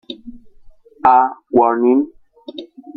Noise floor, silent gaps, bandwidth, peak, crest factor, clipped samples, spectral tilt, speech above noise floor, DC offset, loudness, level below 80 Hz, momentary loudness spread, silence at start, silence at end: -43 dBFS; none; 4.9 kHz; 0 dBFS; 18 dB; under 0.1%; -8 dB/octave; 29 dB; under 0.1%; -14 LUFS; -52 dBFS; 21 LU; 0.1 s; 0.3 s